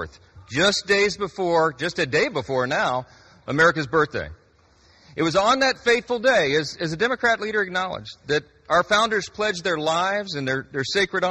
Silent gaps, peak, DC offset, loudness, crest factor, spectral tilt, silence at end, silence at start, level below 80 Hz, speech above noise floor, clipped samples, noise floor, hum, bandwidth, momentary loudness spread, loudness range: none; -6 dBFS; under 0.1%; -22 LUFS; 16 dB; -3.5 dB/octave; 0 s; 0 s; -54 dBFS; 35 dB; under 0.1%; -57 dBFS; none; 11.5 kHz; 9 LU; 2 LU